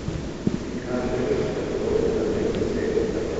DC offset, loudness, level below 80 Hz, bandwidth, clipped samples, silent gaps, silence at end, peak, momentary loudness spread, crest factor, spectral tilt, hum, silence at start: under 0.1%; -25 LUFS; -38 dBFS; 8.2 kHz; under 0.1%; none; 0 s; -6 dBFS; 5 LU; 18 dB; -6.5 dB/octave; none; 0 s